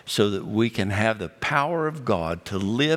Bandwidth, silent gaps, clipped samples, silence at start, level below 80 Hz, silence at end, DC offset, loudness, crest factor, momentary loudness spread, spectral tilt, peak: 16 kHz; none; under 0.1%; 0.05 s; -58 dBFS; 0 s; under 0.1%; -25 LUFS; 20 dB; 5 LU; -5.5 dB/octave; -4 dBFS